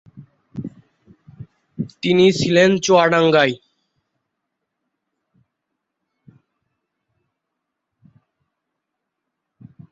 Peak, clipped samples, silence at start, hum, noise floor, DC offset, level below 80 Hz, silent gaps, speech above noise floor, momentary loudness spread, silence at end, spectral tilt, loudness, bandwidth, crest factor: -2 dBFS; under 0.1%; 0.15 s; none; -79 dBFS; under 0.1%; -60 dBFS; none; 65 dB; 21 LU; 6.35 s; -5 dB/octave; -15 LUFS; 8 kHz; 20 dB